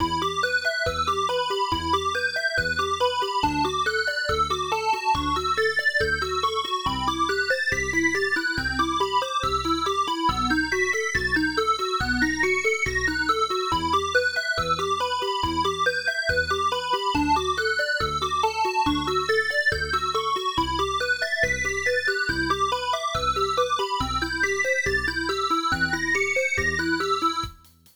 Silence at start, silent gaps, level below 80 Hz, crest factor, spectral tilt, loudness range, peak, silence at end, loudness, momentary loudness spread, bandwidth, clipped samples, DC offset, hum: 0 s; none; -42 dBFS; 14 dB; -3 dB/octave; 1 LU; -10 dBFS; 0.4 s; -23 LUFS; 3 LU; over 20 kHz; under 0.1%; under 0.1%; none